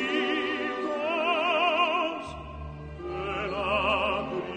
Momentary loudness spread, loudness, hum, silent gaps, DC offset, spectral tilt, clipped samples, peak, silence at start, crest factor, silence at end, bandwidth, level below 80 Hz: 15 LU; -27 LUFS; none; none; under 0.1%; -5 dB/octave; under 0.1%; -14 dBFS; 0 s; 14 dB; 0 s; 9.4 kHz; -48 dBFS